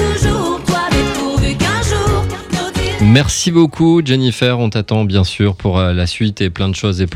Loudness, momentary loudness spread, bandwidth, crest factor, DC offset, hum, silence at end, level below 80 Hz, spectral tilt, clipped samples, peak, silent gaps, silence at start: -14 LUFS; 6 LU; 15 kHz; 14 dB; under 0.1%; none; 0 s; -26 dBFS; -5.5 dB/octave; under 0.1%; 0 dBFS; none; 0 s